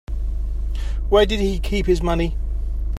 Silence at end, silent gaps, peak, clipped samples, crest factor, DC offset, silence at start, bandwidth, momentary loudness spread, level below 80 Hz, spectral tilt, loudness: 0 s; none; -4 dBFS; under 0.1%; 16 dB; under 0.1%; 0.1 s; 13.5 kHz; 11 LU; -22 dBFS; -6.5 dB/octave; -22 LUFS